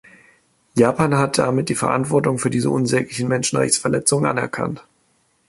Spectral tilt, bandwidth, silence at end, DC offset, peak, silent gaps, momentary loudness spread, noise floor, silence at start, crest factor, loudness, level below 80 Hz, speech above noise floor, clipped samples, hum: -4.5 dB/octave; 12 kHz; 0.7 s; under 0.1%; -2 dBFS; none; 7 LU; -63 dBFS; 0.75 s; 18 dB; -19 LUFS; -54 dBFS; 44 dB; under 0.1%; none